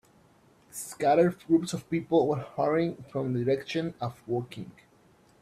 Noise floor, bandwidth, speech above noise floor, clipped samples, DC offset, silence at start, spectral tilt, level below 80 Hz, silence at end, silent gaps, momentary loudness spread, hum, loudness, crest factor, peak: -61 dBFS; 14.5 kHz; 33 dB; under 0.1%; under 0.1%; 0.75 s; -6.5 dB/octave; -66 dBFS; 0.7 s; none; 15 LU; none; -28 LUFS; 18 dB; -10 dBFS